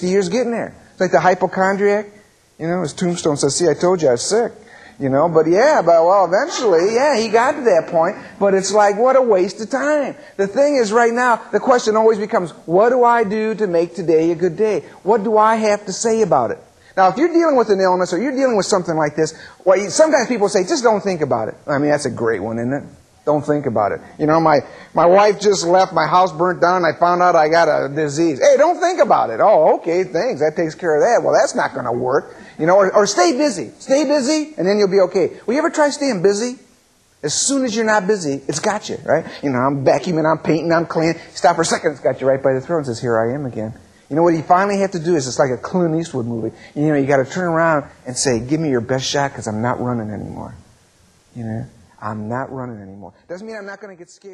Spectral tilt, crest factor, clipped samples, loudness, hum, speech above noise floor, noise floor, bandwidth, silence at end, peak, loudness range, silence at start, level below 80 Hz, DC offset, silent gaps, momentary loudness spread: -4.5 dB/octave; 16 dB; under 0.1%; -16 LUFS; none; 39 dB; -55 dBFS; 11.5 kHz; 0 s; -2 dBFS; 5 LU; 0 s; -56 dBFS; under 0.1%; none; 11 LU